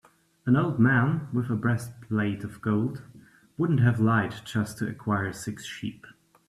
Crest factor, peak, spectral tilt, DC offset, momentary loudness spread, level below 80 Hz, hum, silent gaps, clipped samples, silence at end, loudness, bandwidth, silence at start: 18 dB; -10 dBFS; -7 dB/octave; under 0.1%; 14 LU; -60 dBFS; none; none; under 0.1%; 0.4 s; -27 LUFS; 13.5 kHz; 0.45 s